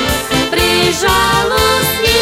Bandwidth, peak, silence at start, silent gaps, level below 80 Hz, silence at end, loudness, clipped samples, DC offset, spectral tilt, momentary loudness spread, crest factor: 16 kHz; 0 dBFS; 0 s; none; -28 dBFS; 0 s; -12 LUFS; under 0.1%; under 0.1%; -3 dB/octave; 3 LU; 12 dB